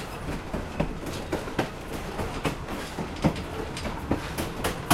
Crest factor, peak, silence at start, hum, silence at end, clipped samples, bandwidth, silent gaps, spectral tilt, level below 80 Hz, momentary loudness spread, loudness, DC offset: 24 dB; -6 dBFS; 0 s; none; 0 s; under 0.1%; 16 kHz; none; -5 dB/octave; -40 dBFS; 6 LU; -32 LUFS; under 0.1%